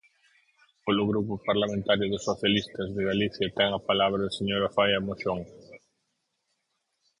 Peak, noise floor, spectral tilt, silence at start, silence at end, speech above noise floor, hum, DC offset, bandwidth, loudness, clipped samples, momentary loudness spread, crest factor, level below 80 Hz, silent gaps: -8 dBFS; -78 dBFS; -5.5 dB/octave; 0.85 s; 1.45 s; 51 dB; none; under 0.1%; 10.5 kHz; -27 LUFS; under 0.1%; 7 LU; 20 dB; -56 dBFS; none